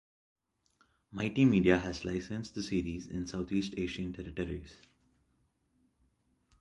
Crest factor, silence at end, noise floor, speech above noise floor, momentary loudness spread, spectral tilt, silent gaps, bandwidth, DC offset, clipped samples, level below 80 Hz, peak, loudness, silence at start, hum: 24 dB; 1.85 s; -75 dBFS; 42 dB; 13 LU; -6.5 dB/octave; none; 11 kHz; under 0.1%; under 0.1%; -54 dBFS; -10 dBFS; -33 LUFS; 1.1 s; none